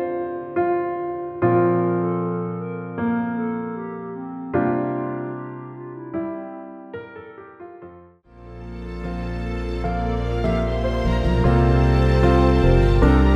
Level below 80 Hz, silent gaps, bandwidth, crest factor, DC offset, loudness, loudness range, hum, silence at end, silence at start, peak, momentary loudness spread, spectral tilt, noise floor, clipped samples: -26 dBFS; none; 7.6 kHz; 16 dB; under 0.1%; -22 LUFS; 15 LU; none; 0 s; 0 s; -4 dBFS; 20 LU; -8.5 dB/octave; -46 dBFS; under 0.1%